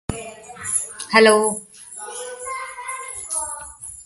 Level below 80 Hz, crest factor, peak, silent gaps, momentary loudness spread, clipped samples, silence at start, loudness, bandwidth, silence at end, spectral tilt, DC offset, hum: -48 dBFS; 22 dB; -2 dBFS; none; 20 LU; under 0.1%; 0.1 s; -21 LUFS; 12 kHz; 0 s; -2 dB/octave; under 0.1%; none